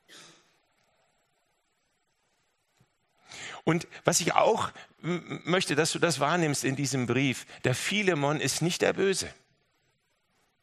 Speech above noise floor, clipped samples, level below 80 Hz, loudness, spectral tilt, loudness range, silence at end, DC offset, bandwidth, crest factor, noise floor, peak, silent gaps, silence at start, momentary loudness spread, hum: 47 dB; under 0.1%; -70 dBFS; -27 LUFS; -4 dB/octave; 5 LU; 1.3 s; under 0.1%; 13 kHz; 26 dB; -75 dBFS; -4 dBFS; none; 0.1 s; 10 LU; none